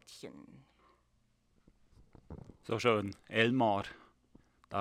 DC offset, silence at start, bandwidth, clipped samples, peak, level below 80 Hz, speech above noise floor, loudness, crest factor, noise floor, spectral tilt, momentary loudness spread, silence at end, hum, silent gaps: under 0.1%; 0.1 s; 14.5 kHz; under 0.1%; -12 dBFS; -66 dBFS; 40 dB; -32 LUFS; 24 dB; -73 dBFS; -5.5 dB/octave; 23 LU; 0 s; none; none